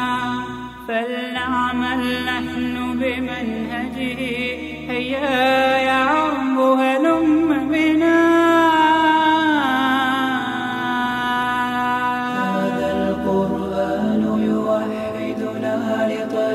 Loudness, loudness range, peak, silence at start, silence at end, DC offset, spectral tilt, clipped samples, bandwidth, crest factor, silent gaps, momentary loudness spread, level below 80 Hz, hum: -19 LUFS; 7 LU; -4 dBFS; 0 s; 0 s; under 0.1%; -5.5 dB/octave; under 0.1%; 14.5 kHz; 14 dB; none; 10 LU; -48 dBFS; none